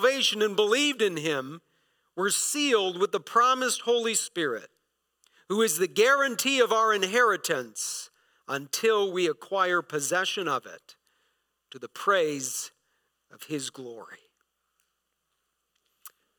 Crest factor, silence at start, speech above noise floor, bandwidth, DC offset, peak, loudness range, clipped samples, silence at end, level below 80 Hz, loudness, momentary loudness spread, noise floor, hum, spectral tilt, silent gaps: 20 dB; 0 s; 53 dB; 19 kHz; under 0.1%; -8 dBFS; 8 LU; under 0.1%; 0.3 s; -88 dBFS; -26 LUFS; 14 LU; -79 dBFS; none; -2 dB/octave; none